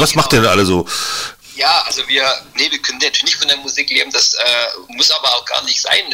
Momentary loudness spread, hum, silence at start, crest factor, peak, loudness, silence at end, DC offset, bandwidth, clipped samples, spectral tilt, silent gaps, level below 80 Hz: 6 LU; none; 0 s; 14 dB; -2 dBFS; -13 LUFS; 0 s; under 0.1%; 16.5 kHz; under 0.1%; -2 dB/octave; none; -42 dBFS